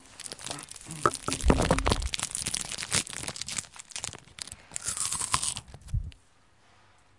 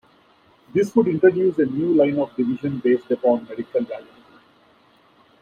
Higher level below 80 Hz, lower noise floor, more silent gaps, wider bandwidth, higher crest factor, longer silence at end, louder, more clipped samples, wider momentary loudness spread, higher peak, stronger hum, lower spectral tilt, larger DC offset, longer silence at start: first, -38 dBFS vs -64 dBFS; first, -63 dBFS vs -56 dBFS; neither; first, 11.5 kHz vs 9 kHz; first, 26 dB vs 18 dB; second, 1 s vs 1.4 s; second, -31 LUFS vs -21 LUFS; neither; first, 14 LU vs 9 LU; about the same, -6 dBFS vs -4 dBFS; neither; second, -3 dB/octave vs -8 dB/octave; neither; second, 0.05 s vs 0.75 s